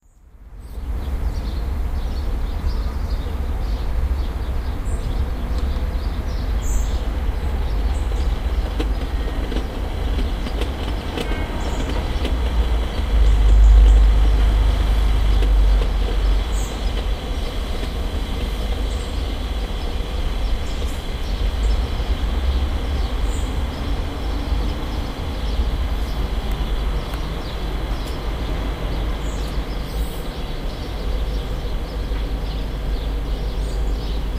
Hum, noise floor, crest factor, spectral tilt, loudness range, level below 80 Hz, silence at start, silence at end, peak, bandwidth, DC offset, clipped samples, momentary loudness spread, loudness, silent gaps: none; -44 dBFS; 16 dB; -6 dB/octave; 9 LU; -20 dBFS; 0.4 s; 0 s; -2 dBFS; 15 kHz; under 0.1%; under 0.1%; 8 LU; -24 LUFS; none